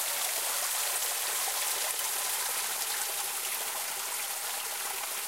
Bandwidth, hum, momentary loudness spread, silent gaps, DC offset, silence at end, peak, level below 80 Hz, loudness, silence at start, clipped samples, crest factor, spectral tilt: 16 kHz; none; 4 LU; none; under 0.1%; 0 s; -16 dBFS; -82 dBFS; -30 LUFS; 0 s; under 0.1%; 16 dB; 3 dB/octave